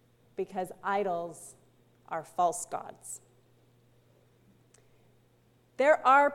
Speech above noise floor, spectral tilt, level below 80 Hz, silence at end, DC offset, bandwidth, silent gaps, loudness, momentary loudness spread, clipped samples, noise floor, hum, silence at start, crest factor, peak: 37 dB; -3.5 dB/octave; -76 dBFS; 0 s; under 0.1%; 16 kHz; none; -30 LUFS; 21 LU; under 0.1%; -65 dBFS; none; 0.4 s; 22 dB; -12 dBFS